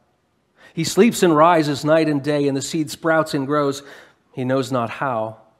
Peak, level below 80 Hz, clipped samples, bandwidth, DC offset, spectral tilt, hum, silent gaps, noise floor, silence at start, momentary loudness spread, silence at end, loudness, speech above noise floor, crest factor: -2 dBFS; -64 dBFS; under 0.1%; 16 kHz; under 0.1%; -5.5 dB/octave; none; none; -65 dBFS; 0.75 s; 11 LU; 0.25 s; -19 LUFS; 46 dB; 18 dB